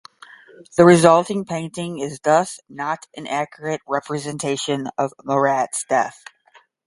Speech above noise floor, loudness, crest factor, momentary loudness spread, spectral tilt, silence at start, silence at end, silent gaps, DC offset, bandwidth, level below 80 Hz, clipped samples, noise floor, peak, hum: 35 dB; -20 LUFS; 20 dB; 15 LU; -5 dB/octave; 0.75 s; 0.75 s; none; under 0.1%; 11.5 kHz; -60 dBFS; under 0.1%; -55 dBFS; 0 dBFS; none